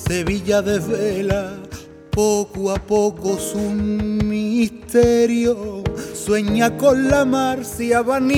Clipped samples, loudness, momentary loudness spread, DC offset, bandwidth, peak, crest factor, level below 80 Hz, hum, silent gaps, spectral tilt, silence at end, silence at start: under 0.1%; -19 LUFS; 10 LU; under 0.1%; 17 kHz; -2 dBFS; 16 dB; -38 dBFS; none; none; -5.5 dB/octave; 0 s; 0 s